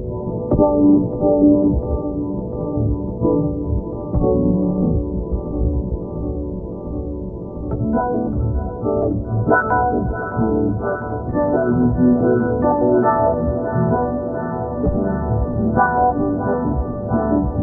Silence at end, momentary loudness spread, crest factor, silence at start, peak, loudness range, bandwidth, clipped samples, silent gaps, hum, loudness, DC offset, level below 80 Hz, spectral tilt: 0 s; 10 LU; 16 dB; 0 s; -2 dBFS; 6 LU; 1.9 kHz; under 0.1%; none; none; -19 LUFS; under 0.1%; -28 dBFS; -12.5 dB/octave